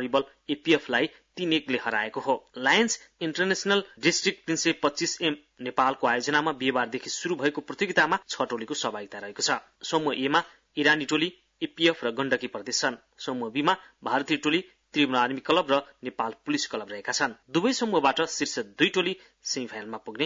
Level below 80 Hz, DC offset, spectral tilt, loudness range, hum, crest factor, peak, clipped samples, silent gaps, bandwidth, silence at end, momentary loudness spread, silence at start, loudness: -70 dBFS; under 0.1%; -3 dB/octave; 2 LU; none; 18 dB; -8 dBFS; under 0.1%; none; 7.8 kHz; 0 s; 9 LU; 0 s; -27 LUFS